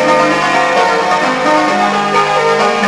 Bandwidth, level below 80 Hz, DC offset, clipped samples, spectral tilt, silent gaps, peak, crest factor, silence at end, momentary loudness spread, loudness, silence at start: 11 kHz; -50 dBFS; under 0.1%; under 0.1%; -3.5 dB/octave; none; 0 dBFS; 10 dB; 0 s; 1 LU; -11 LUFS; 0 s